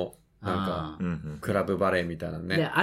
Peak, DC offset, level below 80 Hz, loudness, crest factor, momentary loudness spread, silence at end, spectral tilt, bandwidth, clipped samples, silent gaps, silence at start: -8 dBFS; under 0.1%; -56 dBFS; -30 LUFS; 20 dB; 9 LU; 0 s; -6.5 dB/octave; 16 kHz; under 0.1%; none; 0 s